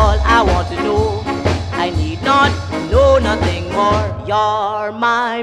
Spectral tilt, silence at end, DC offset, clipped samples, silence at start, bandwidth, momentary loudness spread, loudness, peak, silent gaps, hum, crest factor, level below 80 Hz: -6 dB/octave; 0 s; under 0.1%; under 0.1%; 0 s; 11.5 kHz; 7 LU; -15 LUFS; 0 dBFS; none; none; 14 dB; -24 dBFS